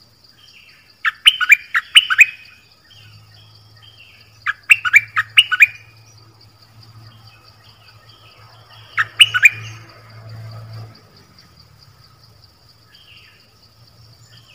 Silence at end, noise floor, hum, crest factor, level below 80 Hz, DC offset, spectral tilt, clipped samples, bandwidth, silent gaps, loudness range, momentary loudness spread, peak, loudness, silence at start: 3.7 s; -50 dBFS; none; 20 dB; -62 dBFS; under 0.1%; 1 dB/octave; 0.4%; 16 kHz; none; 5 LU; 26 LU; 0 dBFS; -12 LUFS; 1.05 s